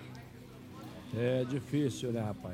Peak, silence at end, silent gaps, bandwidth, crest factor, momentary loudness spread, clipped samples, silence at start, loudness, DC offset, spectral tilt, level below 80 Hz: -20 dBFS; 0 s; none; 16 kHz; 16 dB; 18 LU; under 0.1%; 0 s; -34 LUFS; under 0.1%; -6.5 dB/octave; -64 dBFS